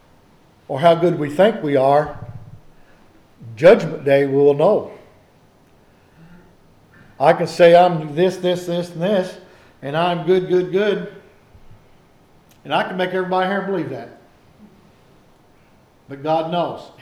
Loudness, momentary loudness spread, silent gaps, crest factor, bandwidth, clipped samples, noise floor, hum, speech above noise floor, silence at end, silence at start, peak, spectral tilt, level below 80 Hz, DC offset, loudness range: -17 LUFS; 17 LU; none; 18 dB; 12.5 kHz; under 0.1%; -52 dBFS; none; 36 dB; 0.15 s; 0.7 s; -2 dBFS; -6.5 dB/octave; -54 dBFS; under 0.1%; 7 LU